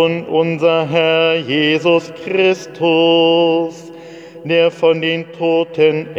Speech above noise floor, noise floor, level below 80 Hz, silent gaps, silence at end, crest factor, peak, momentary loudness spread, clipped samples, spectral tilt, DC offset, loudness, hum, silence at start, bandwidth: 20 dB; -34 dBFS; -66 dBFS; none; 0 s; 14 dB; 0 dBFS; 10 LU; under 0.1%; -6 dB/octave; under 0.1%; -14 LUFS; none; 0 s; 7.8 kHz